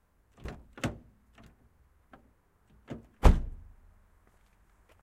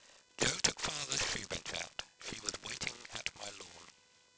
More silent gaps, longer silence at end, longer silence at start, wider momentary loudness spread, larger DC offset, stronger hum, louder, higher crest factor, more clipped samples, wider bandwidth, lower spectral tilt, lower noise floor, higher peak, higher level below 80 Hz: neither; first, 1.5 s vs 0.5 s; first, 0.45 s vs 0 s; first, 22 LU vs 15 LU; neither; neither; first, -31 LUFS vs -37 LUFS; about the same, 28 dB vs 26 dB; neither; first, 13 kHz vs 8 kHz; first, -6.5 dB/octave vs -1 dB/octave; about the same, -66 dBFS vs -64 dBFS; first, -6 dBFS vs -14 dBFS; first, -36 dBFS vs -62 dBFS